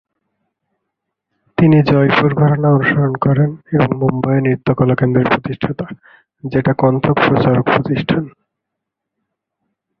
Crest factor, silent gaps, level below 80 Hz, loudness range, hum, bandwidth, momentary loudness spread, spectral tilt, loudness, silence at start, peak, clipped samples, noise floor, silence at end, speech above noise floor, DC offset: 14 dB; none; -46 dBFS; 3 LU; none; 5.4 kHz; 10 LU; -10 dB/octave; -14 LUFS; 1.6 s; 0 dBFS; under 0.1%; -79 dBFS; 1.7 s; 65 dB; under 0.1%